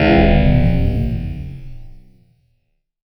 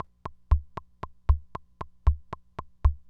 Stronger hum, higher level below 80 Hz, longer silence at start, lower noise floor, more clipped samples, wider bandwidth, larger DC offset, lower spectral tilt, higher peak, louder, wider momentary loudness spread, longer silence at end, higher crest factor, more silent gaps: neither; first, -22 dBFS vs -30 dBFS; second, 0 s vs 0.25 s; first, -67 dBFS vs -44 dBFS; neither; first, 5.8 kHz vs 4.2 kHz; neither; about the same, -9.5 dB/octave vs -9 dB/octave; first, -2 dBFS vs -10 dBFS; first, -16 LUFS vs -31 LUFS; first, 19 LU vs 16 LU; first, 1.1 s vs 0.1 s; about the same, 16 dB vs 20 dB; neither